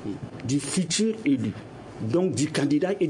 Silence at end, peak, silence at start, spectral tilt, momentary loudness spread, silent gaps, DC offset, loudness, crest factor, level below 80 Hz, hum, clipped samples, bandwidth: 0 s; -12 dBFS; 0 s; -5 dB/octave; 11 LU; none; under 0.1%; -26 LUFS; 12 dB; -60 dBFS; none; under 0.1%; 11 kHz